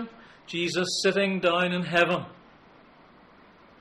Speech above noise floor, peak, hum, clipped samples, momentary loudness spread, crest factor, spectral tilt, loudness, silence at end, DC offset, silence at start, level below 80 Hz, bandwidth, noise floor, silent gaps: 29 dB; -10 dBFS; none; under 0.1%; 11 LU; 20 dB; -4 dB/octave; -25 LUFS; 1.5 s; under 0.1%; 0 s; -66 dBFS; 13.5 kHz; -54 dBFS; none